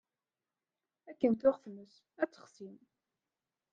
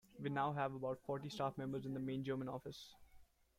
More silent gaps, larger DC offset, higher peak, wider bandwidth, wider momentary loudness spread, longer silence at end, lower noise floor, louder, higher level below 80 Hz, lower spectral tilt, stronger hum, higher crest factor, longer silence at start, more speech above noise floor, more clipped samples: neither; neither; first, -16 dBFS vs -28 dBFS; second, 7.4 kHz vs 15.5 kHz; first, 23 LU vs 10 LU; first, 1.05 s vs 0.35 s; first, under -90 dBFS vs -66 dBFS; first, -34 LUFS vs -44 LUFS; about the same, -78 dBFS vs -74 dBFS; about the same, -7.5 dB/octave vs -7 dB/octave; neither; first, 22 dB vs 16 dB; first, 1.1 s vs 0.1 s; first, over 55 dB vs 23 dB; neither